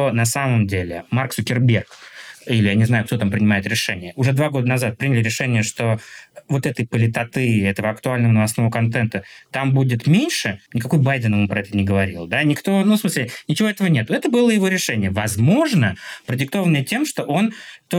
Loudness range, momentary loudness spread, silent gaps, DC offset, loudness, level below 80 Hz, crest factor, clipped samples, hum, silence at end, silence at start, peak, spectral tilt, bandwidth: 2 LU; 7 LU; none; under 0.1%; -19 LUFS; -60 dBFS; 14 dB; under 0.1%; none; 0 s; 0 s; -6 dBFS; -5.5 dB/octave; 17 kHz